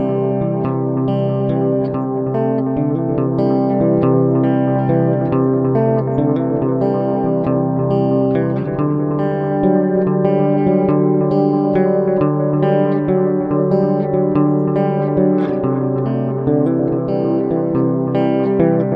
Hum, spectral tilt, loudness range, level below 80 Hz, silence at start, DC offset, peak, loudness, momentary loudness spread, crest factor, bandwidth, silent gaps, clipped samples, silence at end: none; -12 dB/octave; 2 LU; -48 dBFS; 0 s; under 0.1%; -2 dBFS; -16 LUFS; 4 LU; 14 dB; 5.2 kHz; none; under 0.1%; 0 s